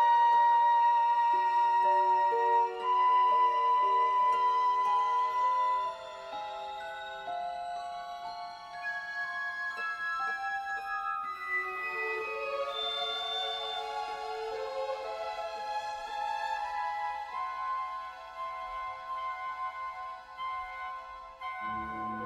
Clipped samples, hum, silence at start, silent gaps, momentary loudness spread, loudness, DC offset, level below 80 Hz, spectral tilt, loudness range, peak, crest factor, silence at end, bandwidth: under 0.1%; none; 0 s; none; 15 LU; -31 LUFS; under 0.1%; -68 dBFS; -2 dB/octave; 12 LU; -18 dBFS; 14 dB; 0 s; 9.4 kHz